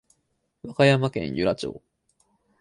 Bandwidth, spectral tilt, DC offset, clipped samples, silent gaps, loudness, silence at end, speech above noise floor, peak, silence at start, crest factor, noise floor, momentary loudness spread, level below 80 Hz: 11.5 kHz; -6.5 dB/octave; under 0.1%; under 0.1%; none; -23 LUFS; 0.85 s; 51 dB; -4 dBFS; 0.65 s; 22 dB; -74 dBFS; 16 LU; -56 dBFS